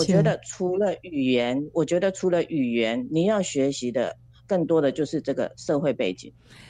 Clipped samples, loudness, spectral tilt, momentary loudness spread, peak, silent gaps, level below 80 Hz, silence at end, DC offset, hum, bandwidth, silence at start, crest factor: under 0.1%; -25 LUFS; -6 dB/octave; 6 LU; -8 dBFS; none; -58 dBFS; 0.05 s; under 0.1%; none; 10.5 kHz; 0 s; 16 dB